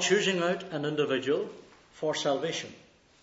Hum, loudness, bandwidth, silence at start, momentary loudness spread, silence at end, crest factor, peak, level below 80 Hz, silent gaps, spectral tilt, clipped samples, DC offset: none; -30 LUFS; 8 kHz; 0 s; 11 LU; 0.45 s; 18 dB; -12 dBFS; -74 dBFS; none; -3.5 dB/octave; under 0.1%; under 0.1%